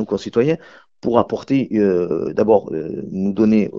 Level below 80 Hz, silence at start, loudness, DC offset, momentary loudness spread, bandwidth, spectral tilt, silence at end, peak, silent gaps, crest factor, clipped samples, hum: -52 dBFS; 0 s; -19 LUFS; 0.1%; 10 LU; 7.4 kHz; -8 dB/octave; 0 s; 0 dBFS; none; 18 dB; under 0.1%; none